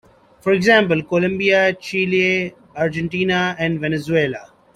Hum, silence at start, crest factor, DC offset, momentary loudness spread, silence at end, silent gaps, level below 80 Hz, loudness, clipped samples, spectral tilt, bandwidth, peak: none; 0.45 s; 18 dB; under 0.1%; 10 LU; 0.3 s; none; -54 dBFS; -18 LUFS; under 0.1%; -6 dB/octave; 12.5 kHz; -2 dBFS